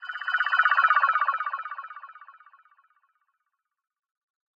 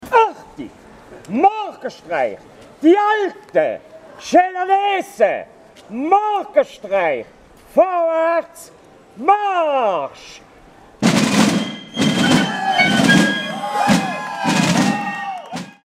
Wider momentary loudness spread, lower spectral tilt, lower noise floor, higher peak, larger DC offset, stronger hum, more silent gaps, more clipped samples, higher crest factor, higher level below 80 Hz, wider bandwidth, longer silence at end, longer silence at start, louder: first, 19 LU vs 14 LU; second, 5 dB/octave vs -4.5 dB/octave; first, -82 dBFS vs -45 dBFS; second, -6 dBFS vs -2 dBFS; neither; neither; neither; neither; first, 22 dB vs 16 dB; second, under -90 dBFS vs -56 dBFS; second, 7.2 kHz vs 16 kHz; first, 2.25 s vs 0.15 s; about the same, 0 s vs 0 s; second, -23 LUFS vs -17 LUFS